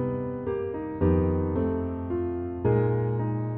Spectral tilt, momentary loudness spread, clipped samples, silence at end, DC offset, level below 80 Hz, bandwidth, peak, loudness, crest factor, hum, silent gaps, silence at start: -10.5 dB/octave; 7 LU; under 0.1%; 0 s; under 0.1%; -42 dBFS; 3.4 kHz; -12 dBFS; -27 LUFS; 14 dB; none; none; 0 s